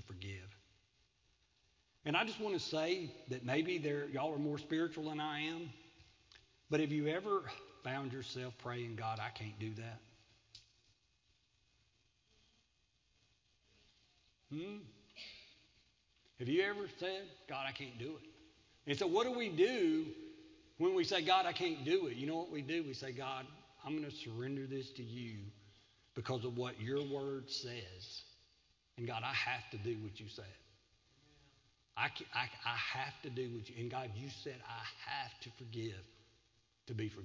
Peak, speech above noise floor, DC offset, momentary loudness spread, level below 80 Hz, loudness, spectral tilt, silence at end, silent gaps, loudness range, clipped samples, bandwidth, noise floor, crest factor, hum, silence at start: -18 dBFS; 38 dB; under 0.1%; 17 LU; -74 dBFS; -40 LUFS; -5.5 dB/octave; 0 s; none; 10 LU; under 0.1%; 7.6 kHz; -78 dBFS; 24 dB; none; 0 s